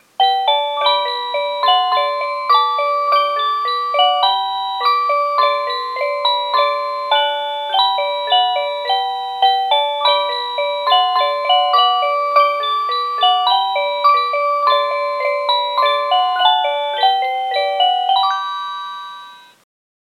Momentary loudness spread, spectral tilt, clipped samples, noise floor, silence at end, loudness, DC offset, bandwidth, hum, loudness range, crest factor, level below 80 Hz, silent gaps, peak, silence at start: 6 LU; 0.5 dB/octave; under 0.1%; -38 dBFS; 0.65 s; -16 LUFS; under 0.1%; 14 kHz; none; 2 LU; 16 dB; under -90 dBFS; none; 0 dBFS; 0.2 s